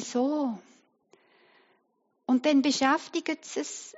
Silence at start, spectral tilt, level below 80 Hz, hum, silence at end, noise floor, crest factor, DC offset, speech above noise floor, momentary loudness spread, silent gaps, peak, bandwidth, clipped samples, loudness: 0 s; -1.5 dB/octave; -82 dBFS; none; 0.05 s; -74 dBFS; 20 dB; under 0.1%; 47 dB; 11 LU; none; -10 dBFS; 8 kHz; under 0.1%; -27 LUFS